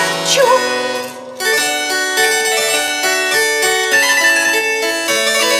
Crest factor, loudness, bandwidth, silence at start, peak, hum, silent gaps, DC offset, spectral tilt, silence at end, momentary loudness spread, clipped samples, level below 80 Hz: 14 dB; -13 LUFS; 16.5 kHz; 0 s; 0 dBFS; none; none; under 0.1%; 0 dB/octave; 0 s; 6 LU; under 0.1%; -74 dBFS